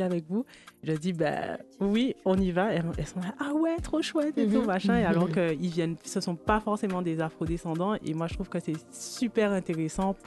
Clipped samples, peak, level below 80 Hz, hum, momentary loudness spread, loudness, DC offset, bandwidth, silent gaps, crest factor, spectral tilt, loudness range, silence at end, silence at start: under 0.1%; -10 dBFS; -48 dBFS; none; 8 LU; -29 LUFS; under 0.1%; 12.5 kHz; none; 18 dB; -6 dB/octave; 3 LU; 0.05 s; 0 s